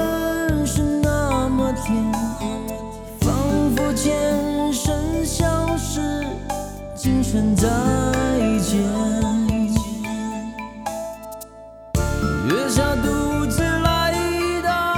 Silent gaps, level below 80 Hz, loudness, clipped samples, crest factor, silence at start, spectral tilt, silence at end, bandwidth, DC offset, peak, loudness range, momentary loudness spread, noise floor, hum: none; -32 dBFS; -21 LUFS; under 0.1%; 16 dB; 0 s; -5.5 dB/octave; 0 s; 19 kHz; under 0.1%; -4 dBFS; 4 LU; 10 LU; -40 dBFS; none